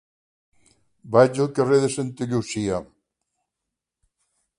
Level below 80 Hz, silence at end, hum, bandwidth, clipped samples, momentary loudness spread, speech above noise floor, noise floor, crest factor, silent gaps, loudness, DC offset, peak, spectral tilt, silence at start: -58 dBFS; 1.75 s; none; 11.5 kHz; under 0.1%; 9 LU; 63 dB; -84 dBFS; 24 dB; none; -22 LUFS; under 0.1%; -2 dBFS; -6 dB/octave; 1.05 s